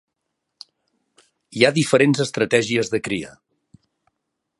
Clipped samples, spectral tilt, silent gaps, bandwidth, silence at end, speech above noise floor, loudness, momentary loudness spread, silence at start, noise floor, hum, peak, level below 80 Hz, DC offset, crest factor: under 0.1%; -4.5 dB/octave; none; 11.5 kHz; 1.3 s; 59 dB; -19 LUFS; 12 LU; 1.5 s; -78 dBFS; none; 0 dBFS; -60 dBFS; under 0.1%; 22 dB